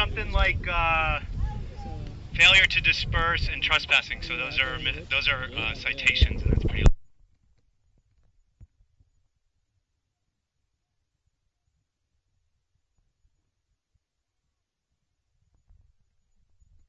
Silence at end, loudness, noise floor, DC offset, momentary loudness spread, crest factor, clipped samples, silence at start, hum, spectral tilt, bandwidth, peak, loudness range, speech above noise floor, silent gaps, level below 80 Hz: 8.25 s; -23 LUFS; -81 dBFS; under 0.1%; 16 LU; 22 dB; under 0.1%; 0 s; none; -4 dB/octave; 8.2 kHz; -6 dBFS; 8 LU; 58 dB; none; -34 dBFS